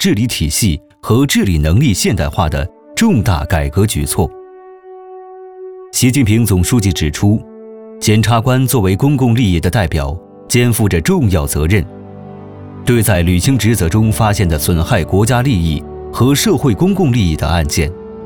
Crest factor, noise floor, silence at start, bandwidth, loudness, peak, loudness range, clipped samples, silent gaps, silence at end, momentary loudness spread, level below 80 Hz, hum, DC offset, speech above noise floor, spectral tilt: 12 dB; -36 dBFS; 0 s; 19.5 kHz; -13 LUFS; 0 dBFS; 3 LU; under 0.1%; none; 0 s; 17 LU; -26 dBFS; none; under 0.1%; 24 dB; -5.5 dB/octave